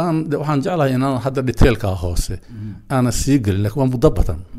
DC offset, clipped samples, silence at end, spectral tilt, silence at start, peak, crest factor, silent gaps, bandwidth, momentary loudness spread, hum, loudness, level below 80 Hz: under 0.1%; under 0.1%; 0 s; -6.5 dB/octave; 0 s; 0 dBFS; 18 dB; none; 15.5 kHz; 9 LU; none; -18 LUFS; -26 dBFS